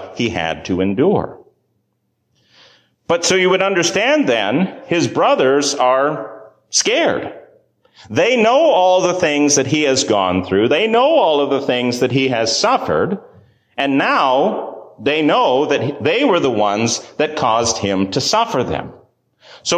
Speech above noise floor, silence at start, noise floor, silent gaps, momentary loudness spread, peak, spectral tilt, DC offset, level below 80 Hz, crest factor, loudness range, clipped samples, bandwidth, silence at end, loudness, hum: 53 dB; 0 s; -68 dBFS; none; 9 LU; -2 dBFS; -3.5 dB/octave; under 0.1%; -48 dBFS; 14 dB; 4 LU; under 0.1%; 15 kHz; 0 s; -15 LUFS; none